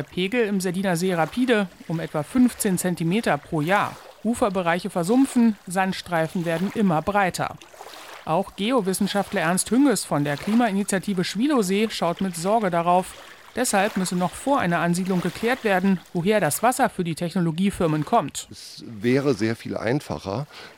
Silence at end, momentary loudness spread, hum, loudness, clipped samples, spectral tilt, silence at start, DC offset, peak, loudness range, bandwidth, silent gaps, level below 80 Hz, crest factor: 0.05 s; 9 LU; none; -23 LUFS; under 0.1%; -5 dB/octave; 0 s; under 0.1%; -6 dBFS; 2 LU; 17 kHz; none; -56 dBFS; 16 dB